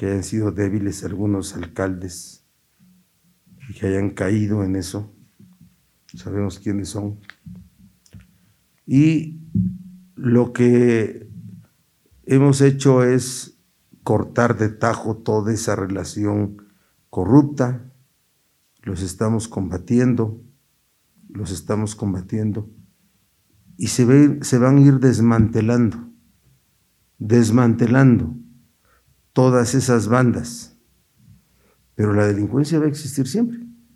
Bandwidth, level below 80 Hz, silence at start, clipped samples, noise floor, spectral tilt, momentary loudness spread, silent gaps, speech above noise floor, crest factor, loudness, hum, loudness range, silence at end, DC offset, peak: 13 kHz; -50 dBFS; 0 s; under 0.1%; -64 dBFS; -7 dB/octave; 18 LU; none; 46 dB; 20 dB; -19 LUFS; none; 10 LU; 0.25 s; under 0.1%; 0 dBFS